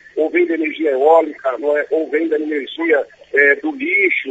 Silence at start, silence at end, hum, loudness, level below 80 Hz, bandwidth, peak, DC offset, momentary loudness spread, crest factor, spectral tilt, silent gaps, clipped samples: 0.15 s; 0 s; none; -16 LUFS; -68 dBFS; 7.8 kHz; 0 dBFS; under 0.1%; 7 LU; 16 dB; -4.5 dB/octave; none; under 0.1%